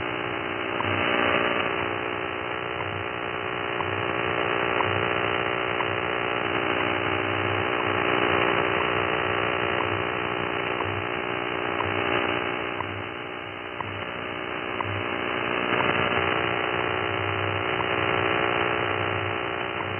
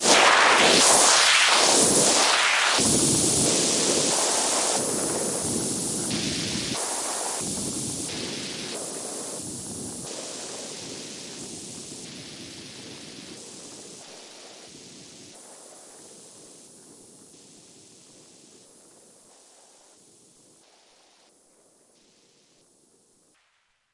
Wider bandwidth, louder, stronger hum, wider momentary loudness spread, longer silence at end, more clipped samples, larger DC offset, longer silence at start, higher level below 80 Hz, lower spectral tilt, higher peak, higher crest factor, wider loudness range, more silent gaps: second, 3.4 kHz vs 11.5 kHz; second, -26 LUFS vs -20 LUFS; neither; second, 7 LU vs 25 LU; second, 0 s vs 7.45 s; neither; neither; about the same, 0 s vs 0 s; first, -54 dBFS vs -60 dBFS; first, -8 dB/octave vs -1 dB/octave; second, -8 dBFS vs -4 dBFS; about the same, 18 dB vs 22 dB; second, 4 LU vs 25 LU; neither